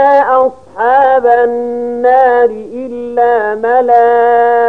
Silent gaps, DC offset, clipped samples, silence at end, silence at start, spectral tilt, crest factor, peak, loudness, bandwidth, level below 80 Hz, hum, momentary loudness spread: none; 0.7%; under 0.1%; 0 s; 0 s; -6 dB/octave; 10 dB; 0 dBFS; -10 LUFS; 4.7 kHz; -52 dBFS; none; 9 LU